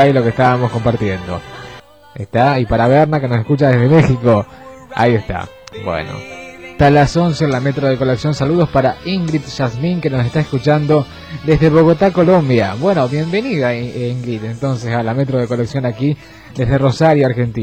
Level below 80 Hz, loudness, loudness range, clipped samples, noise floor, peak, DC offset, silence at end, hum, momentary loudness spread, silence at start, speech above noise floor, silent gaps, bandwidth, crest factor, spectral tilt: -38 dBFS; -14 LUFS; 4 LU; under 0.1%; -37 dBFS; -2 dBFS; 0.2%; 0 s; none; 15 LU; 0 s; 23 dB; none; 9 kHz; 12 dB; -7.5 dB/octave